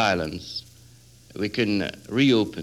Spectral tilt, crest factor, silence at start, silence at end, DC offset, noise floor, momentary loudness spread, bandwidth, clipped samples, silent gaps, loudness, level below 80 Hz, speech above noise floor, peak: -5.5 dB/octave; 16 dB; 0 s; 0 s; under 0.1%; -51 dBFS; 15 LU; 13.5 kHz; under 0.1%; none; -25 LUFS; -54 dBFS; 27 dB; -8 dBFS